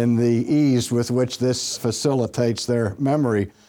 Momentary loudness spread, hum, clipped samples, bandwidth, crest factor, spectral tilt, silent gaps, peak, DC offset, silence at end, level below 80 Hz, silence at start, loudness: 4 LU; none; under 0.1%; 18 kHz; 14 dB; -6 dB/octave; none; -6 dBFS; under 0.1%; 0.2 s; -56 dBFS; 0 s; -21 LUFS